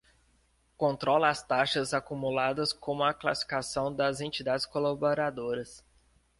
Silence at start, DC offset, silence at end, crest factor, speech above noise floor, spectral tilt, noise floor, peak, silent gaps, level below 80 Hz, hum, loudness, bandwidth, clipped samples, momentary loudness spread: 0.8 s; under 0.1%; 0.6 s; 20 dB; 39 dB; -4 dB/octave; -68 dBFS; -10 dBFS; none; -62 dBFS; none; -30 LUFS; 11.5 kHz; under 0.1%; 6 LU